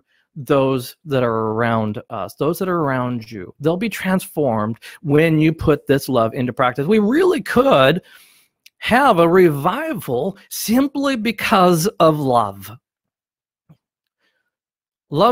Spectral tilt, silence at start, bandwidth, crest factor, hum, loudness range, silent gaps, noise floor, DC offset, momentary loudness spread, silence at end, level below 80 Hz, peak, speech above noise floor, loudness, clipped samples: -6 dB/octave; 0.35 s; 16.5 kHz; 18 dB; none; 5 LU; none; under -90 dBFS; under 0.1%; 12 LU; 0 s; -48 dBFS; 0 dBFS; over 73 dB; -17 LUFS; under 0.1%